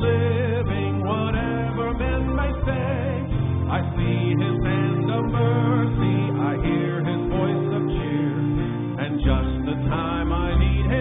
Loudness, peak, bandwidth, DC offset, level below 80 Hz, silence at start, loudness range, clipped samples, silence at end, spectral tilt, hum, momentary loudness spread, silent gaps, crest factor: -23 LUFS; -8 dBFS; 3.9 kHz; under 0.1%; -30 dBFS; 0 s; 2 LU; under 0.1%; 0 s; -12.5 dB/octave; none; 4 LU; none; 14 dB